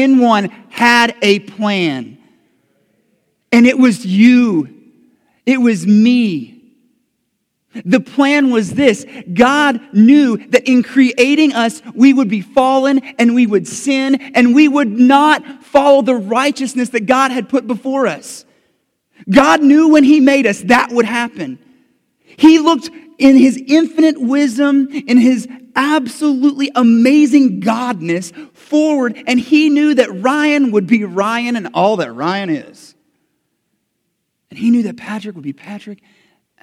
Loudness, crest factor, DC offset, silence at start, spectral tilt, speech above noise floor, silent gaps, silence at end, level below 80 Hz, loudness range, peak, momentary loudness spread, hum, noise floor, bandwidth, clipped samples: -12 LUFS; 12 dB; under 0.1%; 0 s; -5 dB/octave; 58 dB; none; 0.7 s; -56 dBFS; 5 LU; 0 dBFS; 12 LU; none; -69 dBFS; 13 kHz; 0.2%